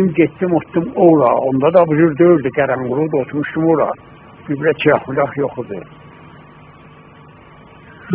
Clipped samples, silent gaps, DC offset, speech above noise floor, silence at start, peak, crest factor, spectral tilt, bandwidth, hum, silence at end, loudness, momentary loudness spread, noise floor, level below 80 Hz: under 0.1%; none; under 0.1%; 27 dB; 0 s; 0 dBFS; 16 dB; -11.5 dB/octave; 4 kHz; none; 0 s; -15 LUFS; 12 LU; -41 dBFS; -52 dBFS